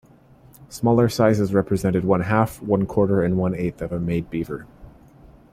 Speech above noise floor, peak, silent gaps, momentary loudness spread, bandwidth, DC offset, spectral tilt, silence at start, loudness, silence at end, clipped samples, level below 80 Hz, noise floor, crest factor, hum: 30 dB; -4 dBFS; none; 10 LU; 15.5 kHz; under 0.1%; -7.5 dB/octave; 0.6 s; -21 LUFS; 0.65 s; under 0.1%; -46 dBFS; -50 dBFS; 18 dB; none